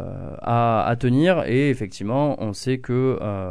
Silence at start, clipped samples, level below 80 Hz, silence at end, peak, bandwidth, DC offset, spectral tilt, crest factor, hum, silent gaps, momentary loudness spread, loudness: 0 s; under 0.1%; -46 dBFS; 0 s; -6 dBFS; 11 kHz; 0.9%; -7.5 dB/octave; 16 dB; none; none; 8 LU; -21 LUFS